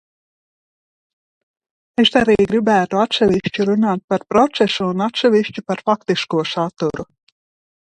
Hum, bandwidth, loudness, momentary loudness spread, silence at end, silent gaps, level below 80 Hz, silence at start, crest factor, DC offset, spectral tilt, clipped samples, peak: none; 9.6 kHz; -17 LUFS; 8 LU; 0.8 s; 4.04-4.08 s; -52 dBFS; 2 s; 18 dB; under 0.1%; -5.5 dB/octave; under 0.1%; 0 dBFS